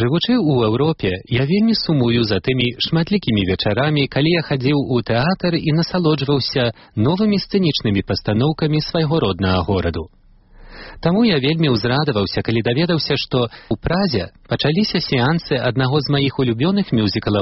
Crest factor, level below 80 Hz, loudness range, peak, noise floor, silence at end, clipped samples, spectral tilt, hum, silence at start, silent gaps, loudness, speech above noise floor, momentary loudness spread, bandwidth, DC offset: 14 dB; -42 dBFS; 2 LU; -2 dBFS; -44 dBFS; 0 s; under 0.1%; -5 dB/octave; none; 0 s; none; -18 LUFS; 27 dB; 4 LU; 6 kHz; under 0.1%